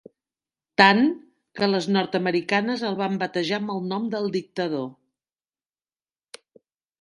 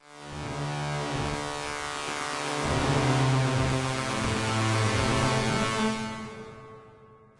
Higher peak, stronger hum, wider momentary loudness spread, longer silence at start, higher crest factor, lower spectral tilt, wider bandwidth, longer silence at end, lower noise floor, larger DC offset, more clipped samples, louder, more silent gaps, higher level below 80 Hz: first, 0 dBFS vs -12 dBFS; neither; about the same, 12 LU vs 14 LU; first, 0.8 s vs 0.1 s; first, 24 dB vs 16 dB; about the same, -5.5 dB/octave vs -5 dB/octave; about the same, 11 kHz vs 11.5 kHz; first, 2.1 s vs 0.25 s; first, under -90 dBFS vs -53 dBFS; neither; neither; first, -23 LUFS vs -28 LUFS; neither; second, -72 dBFS vs -46 dBFS